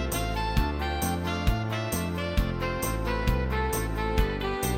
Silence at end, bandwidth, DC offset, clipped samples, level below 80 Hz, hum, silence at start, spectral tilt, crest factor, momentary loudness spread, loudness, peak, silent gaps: 0 s; 17 kHz; under 0.1%; under 0.1%; -32 dBFS; none; 0 s; -5 dB/octave; 18 dB; 2 LU; -29 LUFS; -10 dBFS; none